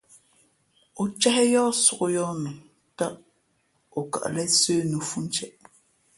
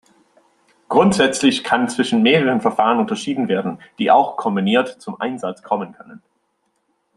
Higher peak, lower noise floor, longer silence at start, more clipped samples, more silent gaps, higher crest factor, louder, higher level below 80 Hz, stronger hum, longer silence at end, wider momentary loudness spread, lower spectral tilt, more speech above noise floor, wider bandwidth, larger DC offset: second, -6 dBFS vs -2 dBFS; about the same, -69 dBFS vs -68 dBFS; about the same, 0.95 s vs 0.9 s; neither; neither; about the same, 20 dB vs 18 dB; second, -24 LUFS vs -18 LUFS; second, -68 dBFS vs -60 dBFS; neither; second, 0.7 s vs 1 s; first, 14 LU vs 11 LU; second, -3 dB/octave vs -5 dB/octave; second, 45 dB vs 51 dB; about the same, 12 kHz vs 12 kHz; neither